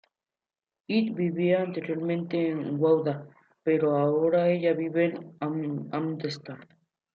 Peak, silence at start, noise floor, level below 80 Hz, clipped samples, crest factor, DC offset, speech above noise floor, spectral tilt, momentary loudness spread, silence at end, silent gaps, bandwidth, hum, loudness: -12 dBFS; 0.9 s; under -90 dBFS; -76 dBFS; under 0.1%; 16 dB; under 0.1%; over 64 dB; -8.5 dB/octave; 10 LU; 0.5 s; none; 7.4 kHz; none; -27 LUFS